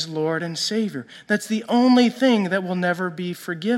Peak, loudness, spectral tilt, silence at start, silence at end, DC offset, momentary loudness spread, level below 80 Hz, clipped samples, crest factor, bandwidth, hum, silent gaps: -6 dBFS; -21 LUFS; -5 dB/octave; 0 s; 0 s; under 0.1%; 12 LU; -74 dBFS; under 0.1%; 16 dB; 14 kHz; none; none